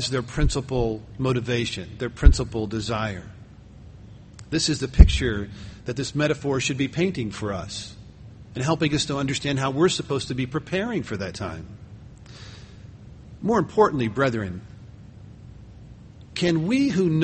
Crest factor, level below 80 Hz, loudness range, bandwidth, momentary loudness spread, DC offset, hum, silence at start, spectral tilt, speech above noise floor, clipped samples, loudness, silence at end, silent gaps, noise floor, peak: 24 dB; -28 dBFS; 4 LU; 8.8 kHz; 24 LU; under 0.1%; none; 0 s; -5.5 dB/octave; 23 dB; under 0.1%; -24 LUFS; 0 s; none; -45 dBFS; 0 dBFS